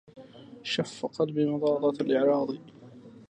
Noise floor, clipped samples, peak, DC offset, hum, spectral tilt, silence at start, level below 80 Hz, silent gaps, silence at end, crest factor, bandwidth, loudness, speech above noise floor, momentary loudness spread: -49 dBFS; under 0.1%; -14 dBFS; under 0.1%; none; -6 dB/octave; 0.15 s; -76 dBFS; none; 0.1 s; 16 dB; 9.8 kHz; -28 LUFS; 22 dB; 14 LU